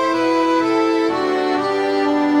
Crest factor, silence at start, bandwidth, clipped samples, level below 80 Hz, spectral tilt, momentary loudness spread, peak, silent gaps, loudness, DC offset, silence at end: 10 dB; 0 s; 11 kHz; under 0.1%; -62 dBFS; -4.5 dB/octave; 2 LU; -6 dBFS; none; -17 LUFS; under 0.1%; 0 s